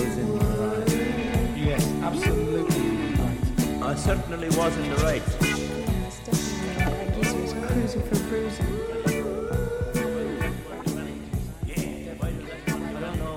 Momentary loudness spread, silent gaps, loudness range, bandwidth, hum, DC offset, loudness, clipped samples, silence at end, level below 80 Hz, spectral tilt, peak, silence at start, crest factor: 7 LU; none; 5 LU; 17 kHz; none; under 0.1%; -27 LUFS; under 0.1%; 0 s; -34 dBFS; -5.5 dB/octave; -10 dBFS; 0 s; 16 dB